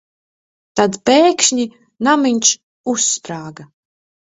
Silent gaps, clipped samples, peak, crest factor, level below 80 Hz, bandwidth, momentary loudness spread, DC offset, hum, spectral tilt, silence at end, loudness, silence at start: 2.63-2.84 s; under 0.1%; 0 dBFS; 18 dB; -60 dBFS; 8 kHz; 13 LU; under 0.1%; none; -2 dB/octave; 0.6 s; -15 LUFS; 0.75 s